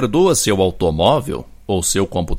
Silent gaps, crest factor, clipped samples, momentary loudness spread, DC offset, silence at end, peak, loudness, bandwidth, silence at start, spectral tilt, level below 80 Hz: none; 16 dB; under 0.1%; 9 LU; under 0.1%; 0 s; 0 dBFS; -16 LUFS; 16.5 kHz; 0 s; -4.5 dB/octave; -32 dBFS